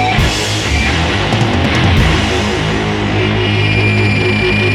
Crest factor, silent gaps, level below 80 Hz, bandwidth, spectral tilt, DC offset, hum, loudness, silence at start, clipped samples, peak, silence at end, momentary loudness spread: 12 dB; none; -22 dBFS; 13.5 kHz; -5 dB/octave; under 0.1%; none; -12 LUFS; 0 s; under 0.1%; 0 dBFS; 0 s; 3 LU